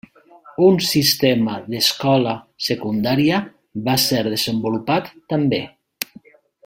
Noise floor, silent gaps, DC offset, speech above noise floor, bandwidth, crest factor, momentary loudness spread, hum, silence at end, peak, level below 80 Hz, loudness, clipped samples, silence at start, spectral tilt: -47 dBFS; none; under 0.1%; 29 dB; 16.5 kHz; 20 dB; 15 LU; none; 0.6 s; 0 dBFS; -56 dBFS; -18 LUFS; under 0.1%; 0.45 s; -4.5 dB/octave